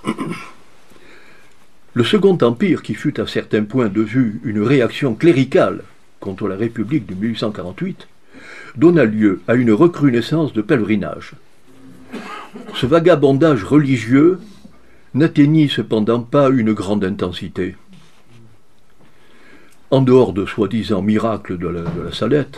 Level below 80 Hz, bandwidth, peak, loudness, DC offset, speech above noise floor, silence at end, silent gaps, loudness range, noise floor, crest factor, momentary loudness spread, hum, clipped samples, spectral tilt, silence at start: -52 dBFS; 12 kHz; 0 dBFS; -16 LUFS; 0.9%; 38 dB; 0 s; none; 5 LU; -54 dBFS; 16 dB; 15 LU; none; under 0.1%; -7.5 dB/octave; 0.05 s